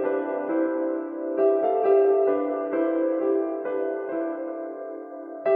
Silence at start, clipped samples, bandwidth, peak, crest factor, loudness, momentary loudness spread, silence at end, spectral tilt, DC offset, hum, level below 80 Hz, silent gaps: 0 s; under 0.1%; 3.6 kHz; -10 dBFS; 16 dB; -25 LUFS; 13 LU; 0 s; -9.5 dB/octave; under 0.1%; none; under -90 dBFS; none